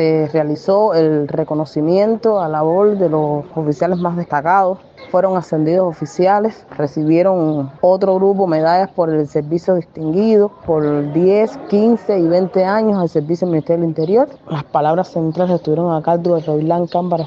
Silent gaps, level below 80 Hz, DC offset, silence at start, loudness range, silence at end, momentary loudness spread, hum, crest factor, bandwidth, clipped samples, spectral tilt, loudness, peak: none; -56 dBFS; under 0.1%; 0 s; 2 LU; 0 s; 6 LU; none; 14 dB; 7.6 kHz; under 0.1%; -8.5 dB/octave; -16 LUFS; -2 dBFS